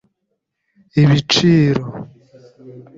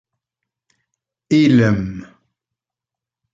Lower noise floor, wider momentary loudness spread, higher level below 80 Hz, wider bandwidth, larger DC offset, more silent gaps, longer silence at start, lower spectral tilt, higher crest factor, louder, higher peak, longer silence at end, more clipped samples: second, -73 dBFS vs -87 dBFS; about the same, 16 LU vs 17 LU; about the same, -48 dBFS vs -48 dBFS; about the same, 7.6 kHz vs 7.8 kHz; neither; neither; second, 0.95 s vs 1.3 s; second, -6 dB/octave vs -7.5 dB/octave; about the same, 16 dB vs 18 dB; about the same, -14 LUFS vs -15 LUFS; about the same, -2 dBFS vs -2 dBFS; second, 0.15 s vs 1.3 s; neither